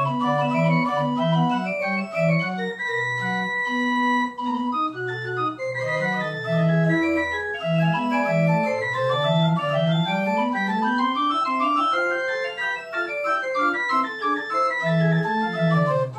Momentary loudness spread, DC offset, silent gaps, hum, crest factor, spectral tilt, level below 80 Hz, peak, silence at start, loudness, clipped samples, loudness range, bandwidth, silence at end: 5 LU; under 0.1%; none; none; 14 dB; -7 dB/octave; -62 dBFS; -10 dBFS; 0 s; -22 LUFS; under 0.1%; 2 LU; 8.4 kHz; 0 s